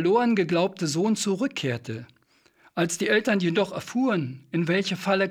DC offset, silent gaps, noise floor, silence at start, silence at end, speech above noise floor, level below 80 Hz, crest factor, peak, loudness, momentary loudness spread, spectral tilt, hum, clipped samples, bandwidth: under 0.1%; none; -62 dBFS; 0 s; 0 s; 37 dB; -72 dBFS; 16 dB; -8 dBFS; -25 LUFS; 8 LU; -5 dB/octave; none; under 0.1%; 16 kHz